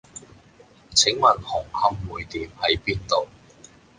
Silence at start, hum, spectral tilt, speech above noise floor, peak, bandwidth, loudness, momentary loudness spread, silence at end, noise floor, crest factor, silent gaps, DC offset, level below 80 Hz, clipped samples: 0.15 s; none; -2 dB/octave; 30 dB; -2 dBFS; 10.5 kHz; -22 LUFS; 16 LU; 0.75 s; -52 dBFS; 22 dB; none; under 0.1%; -46 dBFS; under 0.1%